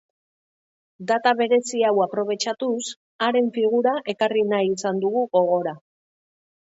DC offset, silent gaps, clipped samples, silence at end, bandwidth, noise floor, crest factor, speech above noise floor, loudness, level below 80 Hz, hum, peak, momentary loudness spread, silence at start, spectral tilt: under 0.1%; 2.96-3.19 s; under 0.1%; 0.9 s; 8 kHz; under -90 dBFS; 16 dB; over 69 dB; -22 LUFS; -76 dBFS; none; -6 dBFS; 6 LU; 1 s; -4 dB/octave